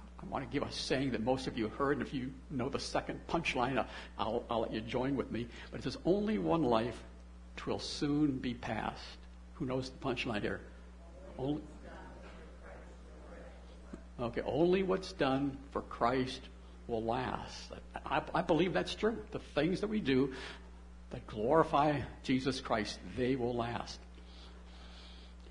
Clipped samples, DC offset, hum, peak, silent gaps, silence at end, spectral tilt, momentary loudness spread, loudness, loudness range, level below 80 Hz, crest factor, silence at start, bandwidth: under 0.1%; under 0.1%; none; -14 dBFS; none; 0 s; -6 dB/octave; 21 LU; -36 LUFS; 7 LU; -52 dBFS; 22 dB; 0 s; 11 kHz